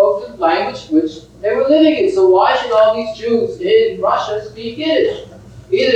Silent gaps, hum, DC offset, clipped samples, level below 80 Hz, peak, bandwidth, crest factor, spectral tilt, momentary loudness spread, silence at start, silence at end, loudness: none; none; under 0.1%; under 0.1%; -50 dBFS; 0 dBFS; 8.8 kHz; 14 dB; -5.5 dB/octave; 11 LU; 0 s; 0 s; -15 LUFS